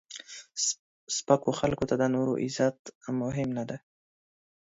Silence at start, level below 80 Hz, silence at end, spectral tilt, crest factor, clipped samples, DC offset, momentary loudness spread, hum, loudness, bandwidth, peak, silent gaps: 0.1 s; -60 dBFS; 1 s; -4.5 dB/octave; 22 dB; under 0.1%; under 0.1%; 14 LU; none; -29 LUFS; 8 kHz; -8 dBFS; 0.79-1.07 s, 2.79-2.85 s, 2.95-3.01 s